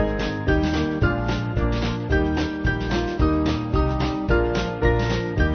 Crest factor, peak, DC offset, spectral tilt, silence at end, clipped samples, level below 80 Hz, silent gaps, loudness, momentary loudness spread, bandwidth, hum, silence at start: 16 dB; -6 dBFS; under 0.1%; -7 dB/octave; 0 s; under 0.1%; -28 dBFS; none; -23 LUFS; 3 LU; 6.6 kHz; none; 0 s